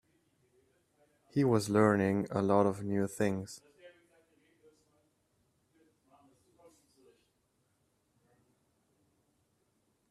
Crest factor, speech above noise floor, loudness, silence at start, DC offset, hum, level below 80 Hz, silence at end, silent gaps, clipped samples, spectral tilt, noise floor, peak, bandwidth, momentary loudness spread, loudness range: 24 dB; 47 dB; -31 LUFS; 1.35 s; under 0.1%; none; -72 dBFS; 6.2 s; none; under 0.1%; -7 dB/octave; -77 dBFS; -12 dBFS; 15 kHz; 12 LU; 11 LU